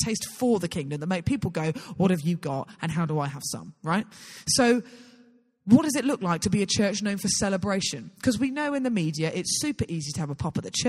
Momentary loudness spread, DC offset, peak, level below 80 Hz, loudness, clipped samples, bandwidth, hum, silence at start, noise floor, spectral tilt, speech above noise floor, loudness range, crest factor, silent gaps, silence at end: 10 LU; under 0.1%; -4 dBFS; -54 dBFS; -26 LUFS; under 0.1%; 15 kHz; none; 0 s; -58 dBFS; -4.5 dB/octave; 32 dB; 4 LU; 22 dB; none; 0 s